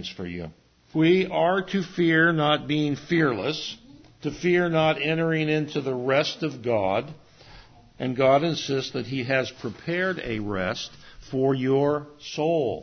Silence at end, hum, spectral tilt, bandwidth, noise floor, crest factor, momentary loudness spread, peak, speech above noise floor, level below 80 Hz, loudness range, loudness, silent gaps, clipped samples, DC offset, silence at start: 0 s; none; -6 dB/octave; 6.6 kHz; -49 dBFS; 18 dB; 13 LU; -6 dBFS; 25 dB; -56 dBFS; 4 LU; -24 LUFS; none; under 0.1%; under 0.1%; 0 s